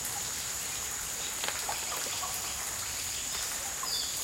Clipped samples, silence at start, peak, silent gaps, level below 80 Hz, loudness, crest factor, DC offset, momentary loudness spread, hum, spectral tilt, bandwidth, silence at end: under 0.1%; 0 s; -12 dBFS; none; -56 dBFS; -32 LUFS; 22 dB; under 0.1%; 2 LU; none; 0.5 dB/octave; 17 kHz; 0 s